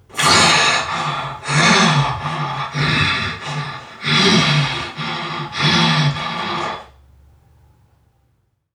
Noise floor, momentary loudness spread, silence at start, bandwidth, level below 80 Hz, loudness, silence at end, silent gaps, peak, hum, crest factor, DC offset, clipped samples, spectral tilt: -64 dBFS; 13 LU; 0.15 s; 15.5 kHz; -46 dBFS; -16 LUFS; 1.9 s; none; 0 dBFS; none; 18 dB; under 0.1%; under 0.1%; -3.5 dB/octave